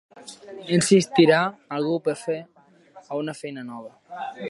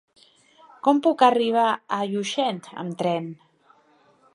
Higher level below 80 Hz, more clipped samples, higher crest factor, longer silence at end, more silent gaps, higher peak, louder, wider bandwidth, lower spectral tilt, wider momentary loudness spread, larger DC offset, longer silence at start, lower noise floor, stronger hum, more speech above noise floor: first, -70 dBFS vs -80 dBFS; neither; about the same, 20 dB vs 22 dB; second, 0 s vs 1 s; neither; about the same, -4 dBFS vs -2 dBFS; about the same, -22 LUFS vs -23 LUFS; about the same, 11.5 kHz vs 11.5 kHz; about the same, -5 dB/octave vs -5 dB/octave; first, 23 LU vs 13 LU; neither; second, 0.15 s vs 0.85 s; second, -51 dBFS vs -59 dBFS; neither; second, 28 dB vs 37 dB